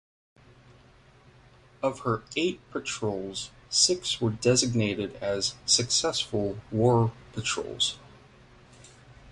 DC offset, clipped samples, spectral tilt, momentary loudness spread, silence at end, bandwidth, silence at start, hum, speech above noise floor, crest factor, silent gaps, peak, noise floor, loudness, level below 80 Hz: under 0.1%; under 0.1%; -3.5 dB/octave; 10 LU; 0 s; 11.5 kHz; 1.8 s; none; 29 dB; 22 dB; none; -8 dBFS; -56 dBFS; -27 LUFS; -56 dBFS